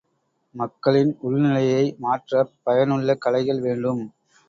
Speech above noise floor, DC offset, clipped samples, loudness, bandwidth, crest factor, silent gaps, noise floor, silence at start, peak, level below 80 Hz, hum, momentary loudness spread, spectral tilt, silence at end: 50 dB; under 0.1%; under 0.1%; -22 LUFS; 7.6 kHz; 18 dB; none; -71 dBFS; 0.55 s; -4 dBFS; -64 dBFS; none; 8 LU; -7.5 dB/octave; 0.4 s